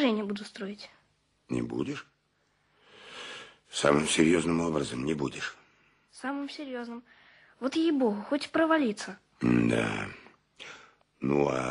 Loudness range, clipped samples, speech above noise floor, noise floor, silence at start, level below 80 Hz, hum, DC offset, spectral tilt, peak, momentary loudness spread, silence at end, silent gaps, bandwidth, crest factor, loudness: 7 LU; under 0.1%; 43 dB; -72 dBFS; 0 s; -58 dBFS; none; under 0.1%; -5 dB/octave; -8 dBFS; 21 LU; 0 s; none; 11 kHz; 22 dB; -29 LUFS